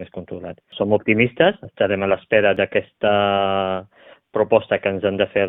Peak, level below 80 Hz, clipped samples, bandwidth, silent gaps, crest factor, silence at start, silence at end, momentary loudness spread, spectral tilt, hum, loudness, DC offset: 0 dBFS; -56 dBFS; under 0.1%; 3.9 kHz; none; 20 dB; 0 s; 0 s; 13 LU; -9.5 dB/octave; none; -19 LUFS; under 0.1%